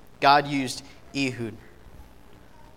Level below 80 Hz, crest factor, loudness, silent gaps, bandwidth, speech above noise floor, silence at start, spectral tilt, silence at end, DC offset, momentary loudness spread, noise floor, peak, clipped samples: -54 dBFS; 24 dB; -24 LUFS; none; 16 kHz; 27 dB; 0.2 s; -4.5 dB/octave; 0.75 s; 0.3%; 17 LU; -51 dBFS; -4 dBFS; under 0.1%